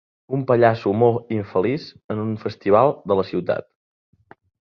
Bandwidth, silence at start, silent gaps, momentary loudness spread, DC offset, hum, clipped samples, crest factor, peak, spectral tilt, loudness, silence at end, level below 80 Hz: 6.2 kHz; 0.3 s; 2.04-2.09 s; 11 LU; under 0.1%; none; under 0.1%; 20 dB; -2 dBFS; -9 dB/octave; -21 LUFS; 1.15 s; -56 dBFS